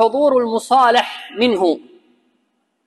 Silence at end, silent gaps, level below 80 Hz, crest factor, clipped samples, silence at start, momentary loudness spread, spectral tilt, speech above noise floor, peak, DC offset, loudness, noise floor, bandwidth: 1.1 s; none; -68 dBFS; 14 dB; under 0.1%; 0 s; 9 LU; -3.5 dB/octave; 52 dB; -2 dBFS; under 0.1%; -16 LUFS; -67 dBFS; 12.5 kHz